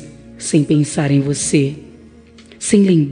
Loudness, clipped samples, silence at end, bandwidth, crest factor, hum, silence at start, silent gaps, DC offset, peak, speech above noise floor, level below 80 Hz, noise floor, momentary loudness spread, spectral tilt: -16 LUFS; under 0.1%; 0 s; 10 kHz; 16 dB; none; 0 s; none; under 0.1%; 0 dBFS; 28 dB; -50 dBFS; -42 dBFS; 12 LU; -5.5 dB/octave